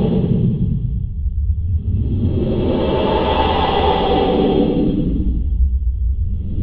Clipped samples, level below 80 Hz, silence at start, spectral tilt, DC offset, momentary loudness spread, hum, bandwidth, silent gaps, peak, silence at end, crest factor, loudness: under 0.1%; -22 dBFS; 0 s; -10.5 dB/octave; under 0.1%; 6 LU; none; 5 kHz; none; -2 dBFS; 0 s; 14 dB; -18 LUFS